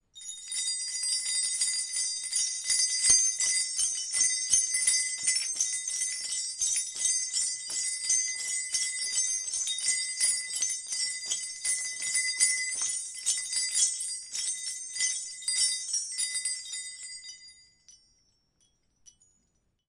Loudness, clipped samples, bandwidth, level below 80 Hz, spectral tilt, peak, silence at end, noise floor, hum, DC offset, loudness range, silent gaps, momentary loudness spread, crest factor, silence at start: -27 LUFS; under 0.1%; 11.5 kHz; -70 dBFS; 4.5 dB/octave; -8 dBFS; 1.95 s; -74 dBFS; none; under 0.1%; 7 LU; none; 8 LU; 24 dB; 0.15 s